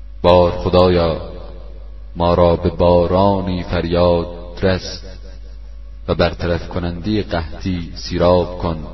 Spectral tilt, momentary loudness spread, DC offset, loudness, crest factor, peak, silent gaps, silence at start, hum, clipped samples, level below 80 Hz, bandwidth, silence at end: -7.5 dB/octave; 23 LU; 1%; -17 LUFS; 16 dB; 0 dBFS; none; 0 s; none; under 0.1%; -30 dBFS; 6.2 kHz; 0 s